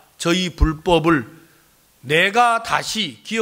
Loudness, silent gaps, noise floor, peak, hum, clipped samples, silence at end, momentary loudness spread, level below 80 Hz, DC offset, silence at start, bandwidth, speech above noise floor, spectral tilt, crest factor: -18 LUFS; none; -55 dBFS; -2 dBFS; none; under 0.1%; 0 s; 8 LU; -32 dBFS; under 0.1%; 0.2 s; 16 kHz; 37 dB; -4.5 dB/octave; 18 dB